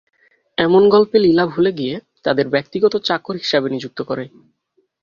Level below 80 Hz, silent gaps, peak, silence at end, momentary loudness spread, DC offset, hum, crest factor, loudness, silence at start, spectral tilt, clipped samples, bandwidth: -56 dBFS; none; -2 dBFS; 0.75 s; 13 LU; under 0.1%; none; 16 dB; -17 LUFS; 0.6 s; -6.5 dB/octave; under 0.1%; 7.2 kHz